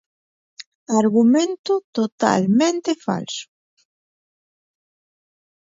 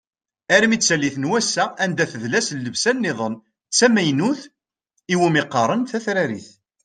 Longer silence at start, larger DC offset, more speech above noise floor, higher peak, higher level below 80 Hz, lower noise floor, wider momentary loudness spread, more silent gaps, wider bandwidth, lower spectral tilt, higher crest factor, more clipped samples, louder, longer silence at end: first, 0.9 s vs 0.5 s; neither; first, over 72 dB vs 53 dB; about the same, -2 dBFS vs -2 dBFS; about the same, -68 dBFS vs -64 dBFS; first, under -90 dBFS vs -73 dBFS; about the same, 11 LU vs 9 LU; first, 1.59-1.64 s, 1.84-1.93 s, 2.12-2.18 s vs none; second, 7.8 kHz vs 10.5 kHz; first, -5 dB/octave vs -3.5 dB/octave; about the same, 20 dB vs 20 dB; neither; about the same, -19 LUFS vs -19 LUFS; first, 2.25 s vs 0.35 s